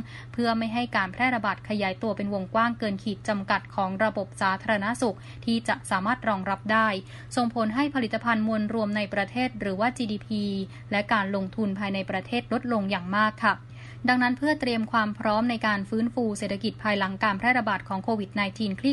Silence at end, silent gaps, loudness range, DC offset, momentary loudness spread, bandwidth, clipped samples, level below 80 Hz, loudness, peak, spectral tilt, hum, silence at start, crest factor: 0 s; none; 2 LU; under 0.1%; 6 LU; 11.5 kHz; under 0.1%; -56 dBFS; -27 LUFS; -8 dBFS; -5.5 dB/octave; none; 0 s; 20 dB